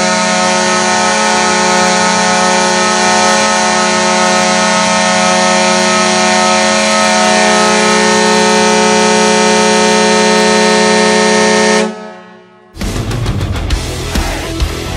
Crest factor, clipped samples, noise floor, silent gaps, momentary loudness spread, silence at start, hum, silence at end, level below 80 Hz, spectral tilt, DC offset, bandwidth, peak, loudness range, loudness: 10 dB; 0.1%; -38 dBFS; none; 9 LU; 0 s; none; 0 s; -28 dBFS; -3 dB/octave; under 0.1%; 16 kHz; 0 dBFS; 4 LU; -9 LUFS